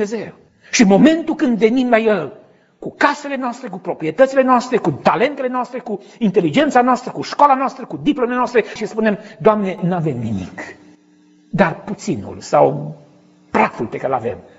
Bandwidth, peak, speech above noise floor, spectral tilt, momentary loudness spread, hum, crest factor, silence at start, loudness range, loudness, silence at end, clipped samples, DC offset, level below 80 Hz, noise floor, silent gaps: 8 kHz; 0 dBFS; 35 dB; -5.5 dB/octave; 13 LU; none; 18 dB; 0 s; 5 LU; -17 LUFS; 0.15 s; under 0.1%; under 0.1%; -54 dBFS; -51 dBFS; none